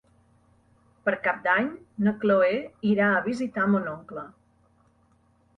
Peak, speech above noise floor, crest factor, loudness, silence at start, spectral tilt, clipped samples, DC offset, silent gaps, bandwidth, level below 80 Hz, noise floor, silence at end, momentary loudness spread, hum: -10 dBFS; 39 dB; 16 dB; -25 LUFS; 1.05 s; -7.5 dB/octave; under 0.1%; under 0.1%; none; 7.6 kHz; -66 dBFS; -64 dBFS; 1.3 s; 14 LU; none